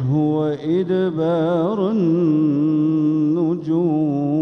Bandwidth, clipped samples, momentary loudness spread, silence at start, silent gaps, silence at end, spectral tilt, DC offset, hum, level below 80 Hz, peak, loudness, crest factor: 6 kHz; under 0.1%; 3 LU; 0 s; none; 0 s; -10 dB/octave; under 0.1%; none; -62 dBFS; -8 dBFS; -19 LUFS; 10 dB